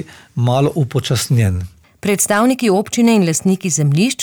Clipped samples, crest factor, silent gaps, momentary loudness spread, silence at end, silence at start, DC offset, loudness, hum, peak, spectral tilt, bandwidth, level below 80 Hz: under 0.1%; 10 dB; none; 8 LU; 0 s; 0 s; under 0.1%; -15 LUFS; none; -4 dBFS; -5 dB/octave; over 20 kHz; -46 dBFS